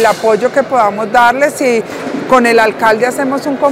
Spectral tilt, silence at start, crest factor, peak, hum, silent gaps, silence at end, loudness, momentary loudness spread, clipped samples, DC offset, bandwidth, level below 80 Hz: -4 dB/octave; 0 s; 10 dB; 0 dBFS; none; none; 0 s; -11 LUFS; 7 LU; 0.4%; under 0.1%; 16.5 kHz; -50 dBFS